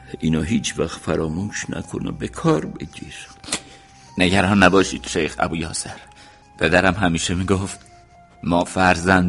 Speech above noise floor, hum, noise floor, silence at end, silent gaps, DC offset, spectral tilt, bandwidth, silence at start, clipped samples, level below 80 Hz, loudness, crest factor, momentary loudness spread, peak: 28 dB; none; -48 dBFS; 0 s; none; under 0.1%; -4.5 dB/octave; 11.5 kHz; 0 s; under 0.1%; -42 dBFS; -20 LUFS; 20 dB; 18 LU; 0 dBFS